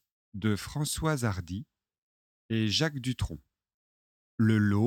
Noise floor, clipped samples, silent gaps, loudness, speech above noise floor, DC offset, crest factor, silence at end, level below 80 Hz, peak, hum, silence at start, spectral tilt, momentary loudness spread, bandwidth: under -90 dBFS; under 0.1%; 1.98-2.49 s, 3.74-4.38 s; -30 LUFS; over 62 dB; under 0.1%; 18 dB; 0 s; -50 dBFS; -14 dBFS; none; 0.35 s; -5.5 dB/octave; 15 LU; 16.5 kHz